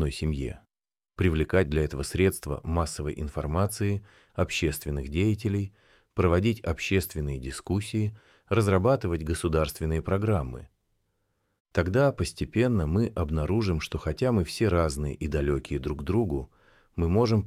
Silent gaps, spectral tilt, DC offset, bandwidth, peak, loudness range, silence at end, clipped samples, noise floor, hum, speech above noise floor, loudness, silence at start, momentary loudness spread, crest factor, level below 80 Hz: 11.60-11.65 s; -6.5 dB/octave; under 0.1%; 15.5 kHz; -10 dBFS; 2 LU; 0 s; under 0.1%; under -90 dBFS; none; over 64 dB; -28 LUFS; 0 s; 9 LU; 16 dB; -38 dBFS